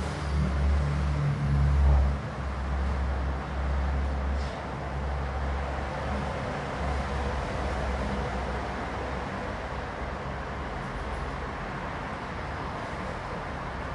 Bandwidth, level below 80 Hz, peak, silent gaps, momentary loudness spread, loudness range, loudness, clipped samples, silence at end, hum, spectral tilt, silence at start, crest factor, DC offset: 10.5 kHz; -32 dBFS; -14 dBFS; none; 8 LU; 7 LU; -31 LUFS; under 0.1%; 0 s; none; -7 dB/octave; 0 s; 16 dB; under 0.1%